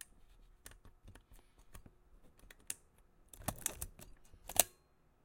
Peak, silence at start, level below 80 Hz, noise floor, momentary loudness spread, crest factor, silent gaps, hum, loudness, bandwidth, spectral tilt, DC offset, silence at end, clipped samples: -4 dBFS; 0 s; -60 dBFS; -70 dBFS; 28 LU; 42 dB; none; none; -38 LUFS; 17 kHz; -1 dB/octave; under 0.1%; 0.55 s; under 0.1%